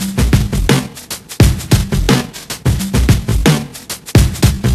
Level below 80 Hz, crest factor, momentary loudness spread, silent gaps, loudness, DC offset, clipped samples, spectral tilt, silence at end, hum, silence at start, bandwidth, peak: -20 dBFS; 14 dB; 12 LU; none; -14 LUFS; under 0.1%; 0.3%; -5.5 dB/octave; 0 s; none; 0 s; 15 kHz; 0 dBFS